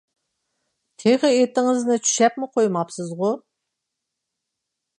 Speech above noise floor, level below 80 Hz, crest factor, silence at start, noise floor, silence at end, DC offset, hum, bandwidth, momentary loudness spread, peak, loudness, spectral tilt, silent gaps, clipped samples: 62 dB; -76 dBFS; 18 dB; 1 s; -81 dBFS; 1.6 s; under 0.1%; none; 11 kHz; 8 LU; -4 dBFS; -20 LUFS; -4 dB/octave; none; under 0.1%